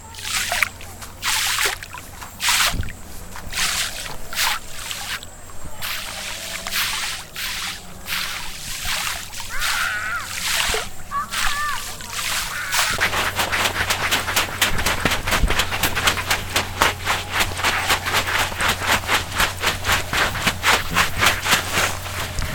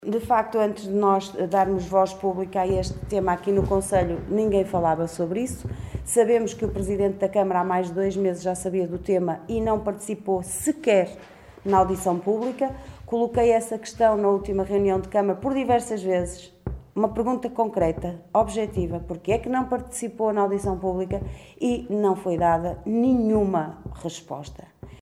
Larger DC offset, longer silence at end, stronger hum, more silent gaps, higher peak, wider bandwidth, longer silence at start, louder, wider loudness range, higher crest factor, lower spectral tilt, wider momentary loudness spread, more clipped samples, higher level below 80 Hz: neither; about the same, 0 s vs 0.05 s; neither; neither; first, 0 dBFS vs -6 dBFS; first, 19 kHz vs 15.5 kHz; about the same, 0 s vs 0 s; first, -21 LUFS vs -24 LUFS; first, 6 LU vs 3 LU; about the same, 22 dB vs 18 dB; second, -1.5 dB/octave vs -6 dB/octave; about the same, 11 LU vs 11 LU; neither; first, -34 dBFS vs -42 dBFS